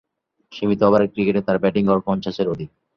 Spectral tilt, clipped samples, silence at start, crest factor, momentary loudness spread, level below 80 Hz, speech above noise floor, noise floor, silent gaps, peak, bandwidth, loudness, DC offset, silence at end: -8.5 dB/octave; under 0.1%; 0.5 s; 18 dB; 9 LU; -52 dBFS; 34 dB; -53 dBFS; none; -2 dBFS; 6.4 kHz; -20 LUFS; under 0.1%; 0.3 s